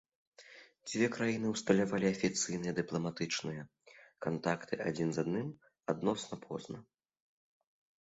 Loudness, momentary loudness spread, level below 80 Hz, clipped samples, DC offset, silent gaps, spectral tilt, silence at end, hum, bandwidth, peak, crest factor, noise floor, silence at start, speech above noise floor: -36 LUFS; 17 LU; -70 dBFS; under 0.1%; under 0.1%; none; -5 dB/octave; 1.2 s; none; 8 kHz; -14 dBFS; 22 dB; -58 dBFS; 0.4 s; 23 dB